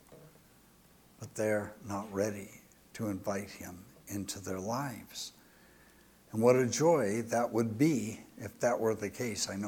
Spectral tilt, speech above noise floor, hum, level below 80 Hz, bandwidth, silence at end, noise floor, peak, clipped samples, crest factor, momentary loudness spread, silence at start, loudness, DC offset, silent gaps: -5 dB/octave; 29 dB; none; -70 dBFS; 19 kHz; 0 s; -62 dBFS; -12 dBFS; under 0.1%; 22 dB; 18 LU; 0.1 s; -33 LUFS; under 0.1%; none